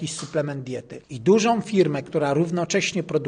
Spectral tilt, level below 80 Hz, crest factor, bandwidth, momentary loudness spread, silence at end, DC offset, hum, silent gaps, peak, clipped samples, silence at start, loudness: -5 dB/octave; -62 dBFS; 16 dB; 10 kHz; 13 LU; 0 s; under 0.1%; none; none; -6 dBFS; under 0.1%; 0 s; -22 LUFS